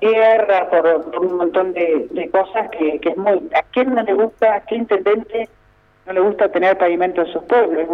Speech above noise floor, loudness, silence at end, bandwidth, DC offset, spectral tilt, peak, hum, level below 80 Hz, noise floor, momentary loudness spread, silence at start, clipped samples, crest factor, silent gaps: 37 dB; -17 LUFS; 0 s; 5.6 kHz; under 0.1%; -7 dB/octave; -4 dBFS; none; -56 dBFS; -53 dBFS; 6 LU; 0 s; under 0.1%; 14 dB; none